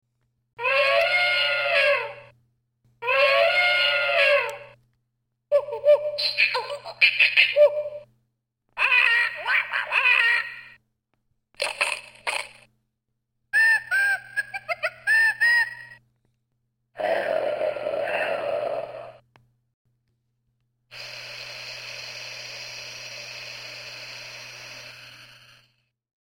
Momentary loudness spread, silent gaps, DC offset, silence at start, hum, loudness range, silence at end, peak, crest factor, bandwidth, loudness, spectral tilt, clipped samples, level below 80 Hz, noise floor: 19 LU; 19.74-19.85 s; under 0.1%; 0.6 s; none; 16 LU; 0.95 s; -4 dBFS; 22 dB; 16.5 kHz; -21 LUFS; -0.5 dB/octave; under 0.1%; -70 dBFS; -78 dBFS